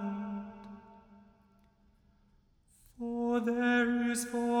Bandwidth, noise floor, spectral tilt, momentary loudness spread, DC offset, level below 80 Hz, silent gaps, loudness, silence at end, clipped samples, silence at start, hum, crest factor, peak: 15 kHz; -67 dBFS; -4.5 dB/octave; 21 LU; under 0.1%; -66 dBFS; none; -32 LUFS; 0 s; under 0.1%; 0 s; none; 16 dB; -18 dBFS